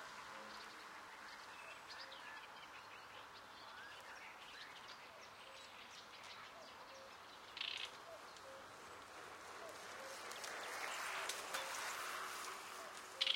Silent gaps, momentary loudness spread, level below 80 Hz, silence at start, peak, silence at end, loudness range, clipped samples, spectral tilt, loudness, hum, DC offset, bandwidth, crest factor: none; 11 LU; -84 dBFS; 0 s; -22 dBFS; 0 s; 9 LU; under 0.1%; 0 dB/octave; -50 LUFS; none; under 0.1%; 16.5 kHz; 28 dB